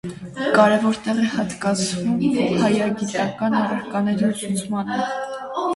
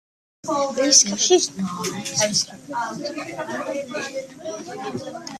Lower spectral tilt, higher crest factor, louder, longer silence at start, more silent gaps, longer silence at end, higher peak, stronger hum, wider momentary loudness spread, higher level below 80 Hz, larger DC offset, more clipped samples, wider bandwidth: first, -5 dB/octave vs -2 dB/octave; about the same, 18 dB vs 22 dB; about the same, -21 LUFS vs -21 LUFS; second, 0.05 s vs 0.45 s; neither; about the same, 0 s vs 0 s; about the same, -2 dBFS vs 0 dBFS; neither; second, 9 LU vs 18 LU; first, -56 dBFS vs -66 dBFS; neither; neither; second, 11.5 kHz vs 14 kHz